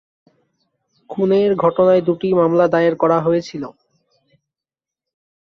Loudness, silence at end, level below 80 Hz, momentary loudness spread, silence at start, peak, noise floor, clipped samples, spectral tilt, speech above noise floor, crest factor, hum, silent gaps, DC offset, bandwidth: -16 LUFS; 1.85 s; -60 dBFS; 16 LU; 1.1 s; -2 dBFS; -88 dBFS; under 0.1%; -8 dB/octave; 73 dB; 16 dB; none; none; under 0.1%; 6.6 kHz